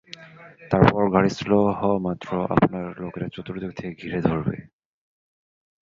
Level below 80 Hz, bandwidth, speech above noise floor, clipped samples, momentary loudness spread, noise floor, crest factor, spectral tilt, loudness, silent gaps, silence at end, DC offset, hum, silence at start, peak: -48 dBFS; 7.4 kHz; 22 dB; under 0.1%; 14 LU; -44 dBFS; 22 dB; -8 dB/octave; -23 LUFS; none; 1.25 s; under 0.1%; none; 0.2 s; -2 dBFS